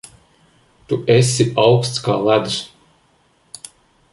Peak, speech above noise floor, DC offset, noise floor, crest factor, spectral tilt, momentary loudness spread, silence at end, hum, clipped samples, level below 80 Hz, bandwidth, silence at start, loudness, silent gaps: -2 dBFS; 42 dB; under 0.1%; -58 dBFS; 16 dB; -5 dB/octave; 22 LU; 1.45 s; none; under 0.1%; -54 dBFS; 11.5 kHz; 0.9 s; -16 LUFS; none